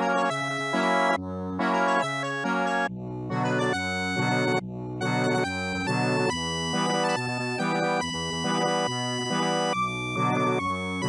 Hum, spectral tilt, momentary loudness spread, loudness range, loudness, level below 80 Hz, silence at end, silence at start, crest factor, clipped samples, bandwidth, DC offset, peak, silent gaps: none; -4.5 dB/octave; 5 LU; 1 LU; -26 LUFS; -58 dBFS; 0 s; 0 s; 14 dB; under 0.1%; 13.5 kHz; under 0.1%; -12 dBFS; none